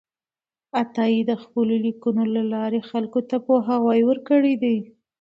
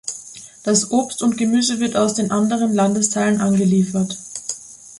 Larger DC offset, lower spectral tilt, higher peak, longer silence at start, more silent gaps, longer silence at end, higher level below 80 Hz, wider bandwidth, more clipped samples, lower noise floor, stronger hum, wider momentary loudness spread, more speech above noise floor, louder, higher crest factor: neither; first, -8 dB/octave vs -4.5 dB/octave; second, -6 dBFS vs -2 dBFS; first, 0.75 s vs 0.05 s; neither; first, 0.35 s vs 0 s; second, -72 dBFS vs -58 dBFS; second, 5.8 kHz vs 11.5 kHz; neither; first, under -90 dBFS vs -38 dBFS; neither; second, 7 LU vs 12 LU; first, over 69 dB vs 21 dB; second, -22 LUFS vs -18 LUFS; about the same, 16 dB vs 16 dB